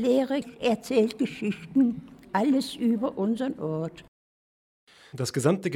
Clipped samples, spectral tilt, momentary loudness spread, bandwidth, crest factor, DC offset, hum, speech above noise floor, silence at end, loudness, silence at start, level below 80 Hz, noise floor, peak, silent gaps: under 0.1%; -6 dB/octave; 8 LU; 16 kHz; 18 dB; under 0.1%; none; over 64 dB; 0 s; -27 LUFS; 0 s; -64 dBFS; under -90 dBFS; -8 dBFS; 4.08-4.87 s